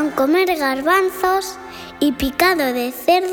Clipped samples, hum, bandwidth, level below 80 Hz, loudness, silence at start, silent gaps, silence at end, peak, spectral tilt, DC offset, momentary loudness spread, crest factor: under 0.1%; none; over 20 kHz; -44 dBFS; -17 LUFS; 0 s; none; 0 s; -2 dBFS; -3.5 dB/octave; under 0.1%; 7 LU; 16 dB